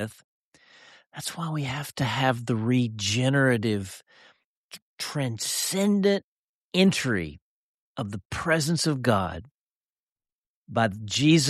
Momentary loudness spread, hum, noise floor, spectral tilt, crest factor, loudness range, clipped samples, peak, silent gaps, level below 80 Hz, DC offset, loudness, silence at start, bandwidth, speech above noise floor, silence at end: 16 LU; none; under -90 dBFS; -4.5 dB/octave; 20 dB; 3 LU; under 0.1%; -8 dBFS; 0.24-0.52 s, 4.44-4.70 s, 4.82-4.97 s, 6.24-6.72 s, 7.42-7.95 s, 8.25-8.30 s, 9.51-10.16 s, 10.32-10.66 s; -58 dBFS; under 0.1%; -26 LUFS; 0 s; 14 kHz; over 65 dB; 0 s